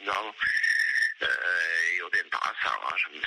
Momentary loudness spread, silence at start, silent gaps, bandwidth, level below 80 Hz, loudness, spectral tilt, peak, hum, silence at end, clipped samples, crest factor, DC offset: 6 LU; 0 s; none; 14 kHz; -68 dBFS; -26 LUFS; 0 dB/octave; -14 dBFS; none; 0 s; under 0.1%; 14 dB; under 0.1%